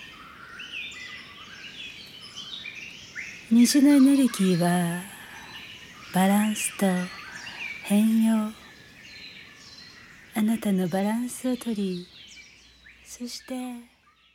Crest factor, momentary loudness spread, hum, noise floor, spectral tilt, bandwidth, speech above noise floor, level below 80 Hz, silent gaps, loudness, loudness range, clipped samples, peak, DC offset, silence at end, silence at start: 16 dB; 24 LU; none; -53 dBFS; -5 dB/octave; 17.5 kHz; 30 dB; -66 dBFS; none; -24 LUFS; 9 LU; under 0.1%; -10 dBFS; under 0.1%; 0.5 s; 0 s